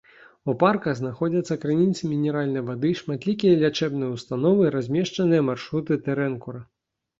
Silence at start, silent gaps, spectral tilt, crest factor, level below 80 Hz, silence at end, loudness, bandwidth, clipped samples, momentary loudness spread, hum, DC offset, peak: 0.45 s; none; -7 dB/octave; 20 dB; -62 dBFS; 0.55 s; -24 LUFS; 7.8 kHz; under 0.1%; 9 LU; none; under 0.1%; -4 dBFS